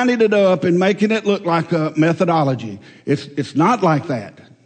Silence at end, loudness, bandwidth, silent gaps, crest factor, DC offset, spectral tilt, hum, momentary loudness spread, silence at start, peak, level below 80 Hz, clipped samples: 0.25 s; -17 LUFS; 9 kHz; none; 14 dB; under 0.1%; -7 dB/octave; none; 11 LU; 0 s; -4 dBFS; -64 dBFS; under 0.1%